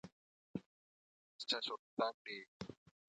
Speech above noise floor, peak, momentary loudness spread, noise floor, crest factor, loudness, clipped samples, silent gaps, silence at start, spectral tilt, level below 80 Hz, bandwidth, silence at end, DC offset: over 47 dB; -24 dBFS; 14 LU; under -90 dBFS; 24 dB; -44 LUFS; under 0.1%; 0.12-0.54 s, 0.66-1.39 s, 1.79-1.97 s, 2.14-2.25 s, 2.48-2.60 s; 0.05 s; -4 dB/octave; -80 dBFS; 9 kHz; 0.35 s; under 0.1%